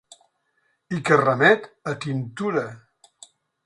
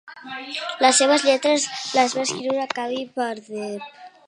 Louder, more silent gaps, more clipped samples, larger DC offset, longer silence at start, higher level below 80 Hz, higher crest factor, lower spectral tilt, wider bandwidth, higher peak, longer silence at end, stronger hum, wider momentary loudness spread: about the same, -22 LUFS vs -21 LUFS; neither; neither; neither; first, 0.9 s vs 0.05 s; first, -64 dBFS vs -78 dBFS; about the same, 22 dB vs 20 dB; first, -6 dB/octave vs -1.5 dB/octave; about the same, 11 kHz vs 11.5 kHz; about the same, -2 dBFS vs -2 dBFS; first, 0.9 s vs 0.2 s; neither; about the same, 15 LU vs 16 LU